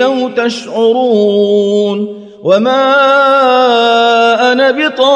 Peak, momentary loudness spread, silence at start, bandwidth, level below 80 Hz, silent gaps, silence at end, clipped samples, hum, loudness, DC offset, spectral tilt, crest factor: 0 dBFS; 8 LU; 0 s; 10.5 kHz; -60 dBFS; none; 0 s; under 0.1%; none; -10 LUFS; under 0.1%; -4.5 dB/octave; 10 dB